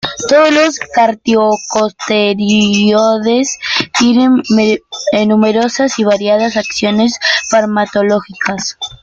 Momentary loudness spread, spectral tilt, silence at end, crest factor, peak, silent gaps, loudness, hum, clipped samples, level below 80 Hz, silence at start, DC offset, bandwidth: 6 LU; -4 dB/octave; 0.05 s; 12 dB; 0 dBFS; none; -12 LUFS; none; under 0.1%; -50 dBFS; 0.05 s; under 0.1%; 7.8 kHz